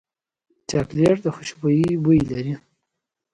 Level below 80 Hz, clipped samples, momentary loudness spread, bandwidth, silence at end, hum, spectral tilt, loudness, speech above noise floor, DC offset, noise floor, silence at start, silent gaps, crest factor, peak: -48 dBFS; under 0.1%; 12 LU; 11 kHz; 0.75 s; none; -7 dB/octave; -21 LUFS; 61 dB; under 0.1%; -81 dBFS; 0.7 s; none; 16 dB; -6 dBFS